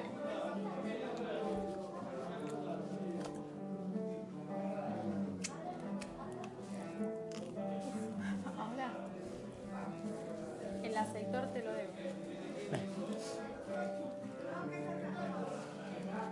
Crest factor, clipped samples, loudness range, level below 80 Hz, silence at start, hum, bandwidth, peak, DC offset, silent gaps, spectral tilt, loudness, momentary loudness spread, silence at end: 18 dB; under 0.1%; 1 LU; -72 dBFS; 0 s; none; 11.5 kHz; -24 dBFS; under 0.1%; none; -6 dB/octave; -43 LUFS; 6 LU; 0 s